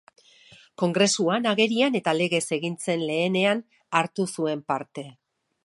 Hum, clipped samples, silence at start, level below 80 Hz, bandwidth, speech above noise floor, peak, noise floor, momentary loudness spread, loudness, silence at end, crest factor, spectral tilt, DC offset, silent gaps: none; under 0.1%; 0.8 s; -76 dBFS; 11.5 kHz; 29 dB; -6 dBFS; -54 dBFS; 9 LU; -24 LUFS; 0.55 s; 20 dB; -4 dB/octave; under 0.1%; none